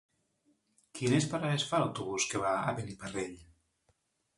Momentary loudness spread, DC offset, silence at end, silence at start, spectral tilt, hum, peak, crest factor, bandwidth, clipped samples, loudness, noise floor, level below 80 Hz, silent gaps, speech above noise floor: 10 LU; under 0.1%; 0.95 s; 0.95 s; -4.5 dB/octave; none; -16 dBFS; 18 dB; 11.5 kHz; under 0.1%; -33 LUFS; -76 dBFS; -66 dBFS; none; 43 dB